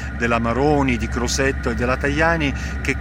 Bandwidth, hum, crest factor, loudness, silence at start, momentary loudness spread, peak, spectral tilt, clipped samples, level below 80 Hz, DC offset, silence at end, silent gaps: 14 kHz; none; 16 dB; -20 LUFS; 0 s; 5 LU; -2 dBFS; -5 dB/octave; under 0.1%; -28 dBFS; under 0.1%; 0 s; none